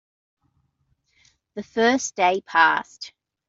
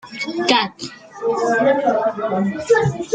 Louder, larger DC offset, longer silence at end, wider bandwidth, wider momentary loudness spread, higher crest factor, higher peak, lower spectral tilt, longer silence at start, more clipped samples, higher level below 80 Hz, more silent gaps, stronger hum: about the same, -20 LUFS vs -18 LUFS; neither; first, 0.4 s vs 0 s; second, 8 kHz vs 9.4 kHz; first, 21 LU vs 10 LU; about the same, 22 dB vs 18 dB; about the same, -4 dBFS vs -2 dBFS; second, -2.5 dB/octave vs -5 dB/octave; first, 1.55 s vs 0.05 s; neither; second, -70 dBFS vs -56 dBFS; neither; neither